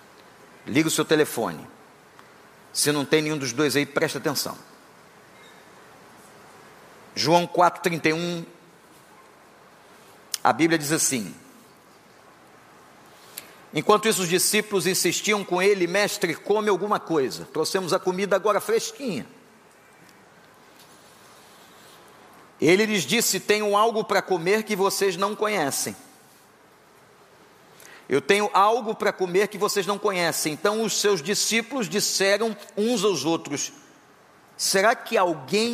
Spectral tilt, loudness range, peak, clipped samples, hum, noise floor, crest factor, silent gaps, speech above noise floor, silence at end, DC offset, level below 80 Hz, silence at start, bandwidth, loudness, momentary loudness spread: -3 dB/octave; 6 LU; -4 dBFS; under 0.1%; none; -54 dBFS; 22 dB; none; 31 dB; 0 s; under 0.1%; -74 dBFS; 0.65 s; 15.5 kHz; -23 LUFS; 10 LU